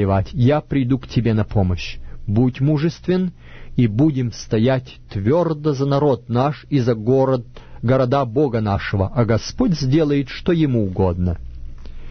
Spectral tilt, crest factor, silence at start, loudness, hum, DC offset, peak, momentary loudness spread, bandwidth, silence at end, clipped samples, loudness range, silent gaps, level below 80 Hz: -8 dB/octave; 16 dB; 0 s; -19 LUFS; none; under 0.1%; -4 dBFS; 7 LU; 6.6 kHz; 0 s; under 0.1%; 1 LU; none; -36 dBFS